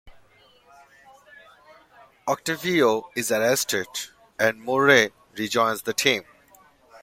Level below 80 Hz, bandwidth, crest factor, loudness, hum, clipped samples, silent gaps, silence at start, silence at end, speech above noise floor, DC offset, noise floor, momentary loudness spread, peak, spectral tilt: -64 dBFS; 16.5 kHz; 22 dB; -23 LUFS; none; under 0.1%; none; 0.05 s; 0.05 s; 34 dB; under 0.1%; -56 dBFS; 14 LU; -2 dBFS; -3 dB/octave